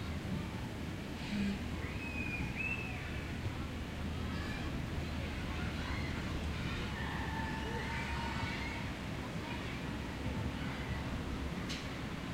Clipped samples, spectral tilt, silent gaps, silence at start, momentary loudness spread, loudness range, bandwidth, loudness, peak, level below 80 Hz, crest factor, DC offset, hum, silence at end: under 0.1%; -5.5 dB/octave; none; 0 s; 4 LU; 1 LU; 16 kHz; -40 LUFS; -24 dBFS; -46 dBFS; 14 dB; under 0.1%; none; 0 s